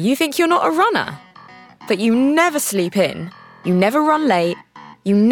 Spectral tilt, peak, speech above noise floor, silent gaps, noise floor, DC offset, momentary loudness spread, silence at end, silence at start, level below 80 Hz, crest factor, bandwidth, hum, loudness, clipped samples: -5 dB/octave; -2 dBFS; 26 dB; none; -43 dBFS; under 0.1%; 13 LU; 0 s; 0 s; -66 dBFS; 16 dB; 18.5 kHz; none; -17 LUFS; under 0.1%